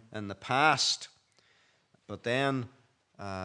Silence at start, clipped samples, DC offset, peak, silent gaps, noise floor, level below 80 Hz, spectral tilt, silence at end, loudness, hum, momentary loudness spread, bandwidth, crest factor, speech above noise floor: 0.1 s; under 0.1%; under 0.1%; -8 dBFS; none; -68 dBFS; -78 dBFS; -3 dB/octave; 0 s; -29 LUFS; none; 22 LU; 11 kHz; 24 dB; 38 dB